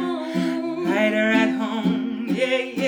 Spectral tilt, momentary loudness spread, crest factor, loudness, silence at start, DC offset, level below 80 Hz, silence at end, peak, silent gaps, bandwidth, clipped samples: -6 dB/octave; 7 LU; 16 dB; -22 LUFS; 0 s; under 0.1%; -64 dBFS; 0 s; -6 dBFS; none; 19 kHz; under 0.1%